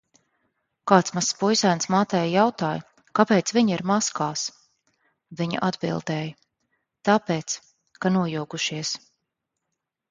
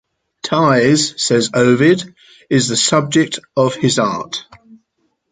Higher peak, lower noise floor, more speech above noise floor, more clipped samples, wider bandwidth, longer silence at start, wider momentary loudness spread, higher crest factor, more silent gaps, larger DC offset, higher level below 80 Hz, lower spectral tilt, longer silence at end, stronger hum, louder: about the same, 0 dBFS vs 0 dBFS; first, -82 dBFS vs -67 dBFS; first, 59 dB vs 52 dB; neither; about the same, 9.6 kHz vs 9.6 kHz; first, 0.85 s vs 0.45 s; about the same, 11 LU vs 11 LU; first, 24 dB vs 14 dB; neither; neither; second, -66 dBFS vs -56 dBFS; about the same, -4.5 dB/octave vs -4 dB/octave; first, 1.15 s vs 0.9 s; neither; second, -24 LUFS vs -14 LUFS